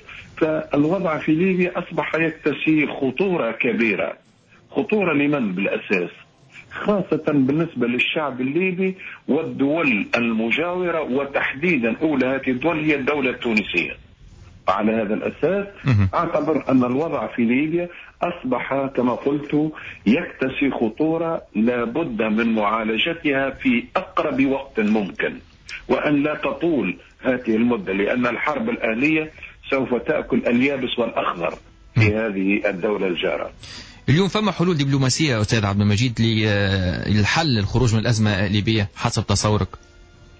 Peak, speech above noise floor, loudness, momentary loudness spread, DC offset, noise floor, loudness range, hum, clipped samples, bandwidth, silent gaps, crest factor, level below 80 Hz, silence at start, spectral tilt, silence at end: -6 dBFS; 31 dB; -21 LUFS; 6 LU; under 0.1%; -51 dBFS; 3 LU; none; under 0.1%; 8 kHz; none; 14 dB; -44 dBFS; 0.1 s; -6 dB/octave; 0.65 s